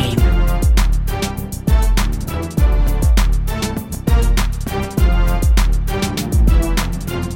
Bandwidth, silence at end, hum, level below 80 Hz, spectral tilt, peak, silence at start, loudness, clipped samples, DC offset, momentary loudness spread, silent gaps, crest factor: 17 kHz; 0 s; none; -16 dBFS; -5.5 dB/octave; -2 dBFS; 0 s; -18 LUFS; under 0.1%; 0.5%; 7 LU; none; 12 dB